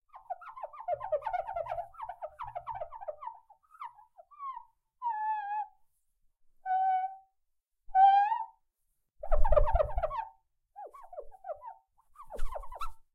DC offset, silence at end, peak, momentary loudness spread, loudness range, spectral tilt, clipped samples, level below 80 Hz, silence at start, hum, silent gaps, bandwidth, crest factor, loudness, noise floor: under 0.1%; 0.15 s; -12 dBFS; 20 LU; 13 LU; -6 dB/octave; under 0.1%; -40 dBFS; 0.15 s; none; none; 4.3 kHz; 20 dB; -33 LUFS; -78 dBFS